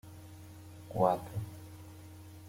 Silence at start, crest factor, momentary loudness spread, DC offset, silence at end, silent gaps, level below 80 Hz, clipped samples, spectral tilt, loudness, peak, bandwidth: 0.05 s; 24 dB; 21 LU; under 0.1%; 0 s; none; -66 dBFS; under 0.1%; -7.5 dB/octave; -34 LUFS; -14 dBFS; 16.5 kHz